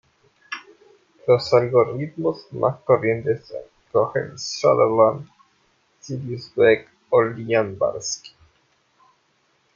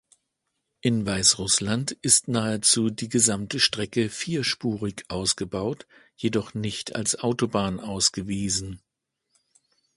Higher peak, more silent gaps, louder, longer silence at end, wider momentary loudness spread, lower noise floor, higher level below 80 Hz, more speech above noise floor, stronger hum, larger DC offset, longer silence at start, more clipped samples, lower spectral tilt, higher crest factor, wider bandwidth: about the same, -2 dBFS vs -4 dBFS; neither; first, -21 LUFS vs -24 LUFS; first, 1.45 s vs 1.2 s; first, 16 LU vs 11 LU; second, -65 dBFS vs -80 dBFS; second, -62 dBFS vs -52 dBFS; second, 45 dB vs 55 dB; neither; neither; second, 0.5 s vs 0.85 s; neither; first, -5 dB/octave vs -3 dB/octave; about the same, 20 dB vs 24 dB; second, 7.6 kHz vs 11.5 kHz